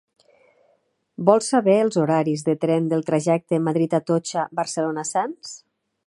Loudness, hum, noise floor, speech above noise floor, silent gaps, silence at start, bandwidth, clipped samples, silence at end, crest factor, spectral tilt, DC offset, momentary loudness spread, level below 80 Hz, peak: -21 LUFS; none; -66 dBFS; 45 dB; none; 1.2 s; 11.5 kHz; under 0.1%; 0.5 s; 20 dB; -6 dB/octave; under 0.1%; 8 LU; -72 dBFS; -2 dBFS